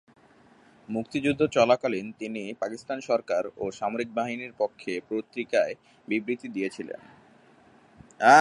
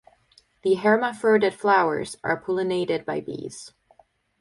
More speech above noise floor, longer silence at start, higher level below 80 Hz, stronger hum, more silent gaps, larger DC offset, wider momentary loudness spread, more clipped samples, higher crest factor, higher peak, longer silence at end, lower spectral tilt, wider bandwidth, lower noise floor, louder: second, 29 dB vs 37 dB; first, 0.9 s vs 0.65 s; about the same, -66 dBFS vs -66 dBFS; neither; neither; neither; about the same, 12 LU vs 14 LU; neither; first, 24 dB vs 18 dB; about the same, -4 dBFS vs -6 dBFS; second, 0 s vs 0.7 s; about the same, -4.5 dB/octave vs -5 dB/octave; about the same, 11.5 kHz vs 11.5 kHz; about the same, -57 dBFS vs -60 dBFS; second, -28 LUFS vs -23 LUFS